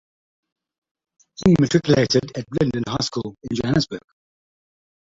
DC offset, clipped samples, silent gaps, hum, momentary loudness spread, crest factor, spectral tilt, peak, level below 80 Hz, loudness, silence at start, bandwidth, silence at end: under 0.1%; under 0.1%; none; none; 11 LU; 20 dB; -6 dB/octave; -2 dBFS; -48 dBFS; -20 LUFS; 1.4 s; 7.8 kHz; 1.05 s